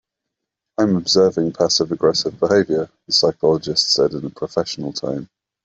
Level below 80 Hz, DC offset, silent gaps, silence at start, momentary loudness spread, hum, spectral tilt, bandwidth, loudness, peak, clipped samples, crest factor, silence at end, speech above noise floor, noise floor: -56 dBFS; under 0.1%; none; 0.8 s; 10 LU; none; -4 dB/octave; 8.2 kHz; -18 LUFS; -2 dBFS; under 0.1%; 18 dB; 0.4 s; 63 dB; -81 dBFS